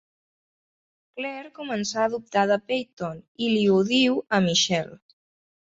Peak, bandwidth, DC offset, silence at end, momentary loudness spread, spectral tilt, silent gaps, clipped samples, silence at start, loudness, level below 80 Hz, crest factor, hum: -8 dBFS; 8 kHz; under 0.1%; 0.7 s; 14 LU; -4 dB/octave; 2.93-2.97 s, 3.28-3.35 s; under 0.1%; 1.15 s; -24 LUFS; -66 dBFS; 18 dB; none